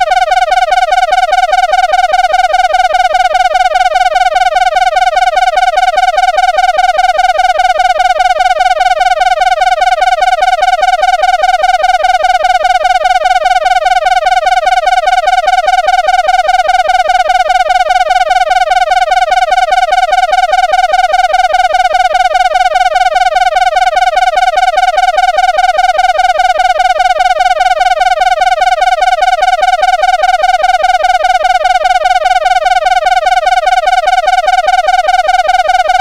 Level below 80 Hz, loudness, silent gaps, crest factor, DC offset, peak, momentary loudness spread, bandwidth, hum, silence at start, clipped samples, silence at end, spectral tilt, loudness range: -32 dBFS; -9 LUFS; none; 8 dB; 0.3%; 0 dBFS; 0 LU; 13 kHz; none; 0 s; under 0.1%; 0 s; 0.5 dB/octave; 0 LU